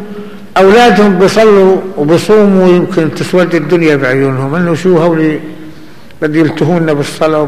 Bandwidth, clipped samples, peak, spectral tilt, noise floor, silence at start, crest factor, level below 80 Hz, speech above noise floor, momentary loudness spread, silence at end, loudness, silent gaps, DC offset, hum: 14.5 kHz; under 0.1%; 0 dBFS; -6.5 dB/octave; -34 dBFS; 0 s; 8 dB; -42 dBFS; 26 dB; 8 LU; 0 s; -8 LUFS; none; 4%; none